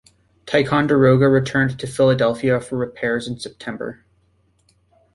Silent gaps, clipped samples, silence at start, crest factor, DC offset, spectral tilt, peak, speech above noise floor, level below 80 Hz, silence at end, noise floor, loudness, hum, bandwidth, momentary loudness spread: none; under 0.1%; 0.45 s; 18 dB; under 0.1%; -6.5 dB/octave; -2 dBFS; 43 dB; -52 dBFS; 1.2 s; -61 dBFS; -18 LUFS; none; 11.5 kHz; 15 LU